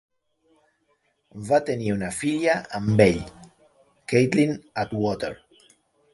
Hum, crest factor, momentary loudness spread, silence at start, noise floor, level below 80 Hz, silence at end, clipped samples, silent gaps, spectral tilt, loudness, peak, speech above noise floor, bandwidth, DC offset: none; 22 dB; 16 LU; 1.35 s; -69 dBFS; -52 dBFS; 0.8 s; under 0.1%; none; -6 dB/octave; -23 LUFS; -2 dBFS; 47 dB; 11.5 kHz; under 0.1%